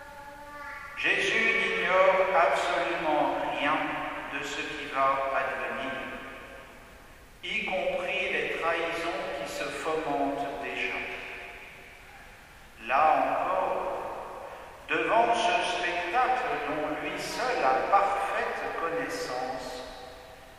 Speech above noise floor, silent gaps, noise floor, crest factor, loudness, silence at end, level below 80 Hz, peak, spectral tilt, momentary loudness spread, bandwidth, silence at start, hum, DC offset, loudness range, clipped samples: 23 dB; none; -51 dBFS; 20 dB; -28 LUFS; 0 s; -56 dBFS; -10 dBFS; -3 dB/octave; 19 LU; 15.5 kHz; 0 s; none; under 0.1%; 7 LU; under 0.1%